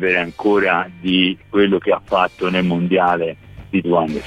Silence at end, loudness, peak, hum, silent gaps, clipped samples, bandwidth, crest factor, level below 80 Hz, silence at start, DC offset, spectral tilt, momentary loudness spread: 0 s; -17 LUFS; -2 dBFS; none; none; under 0.1%; 9.4 kHz; 16 dB; -48 dBFS; 0 s; under 0.1%; -7 dB/octave; 6 LU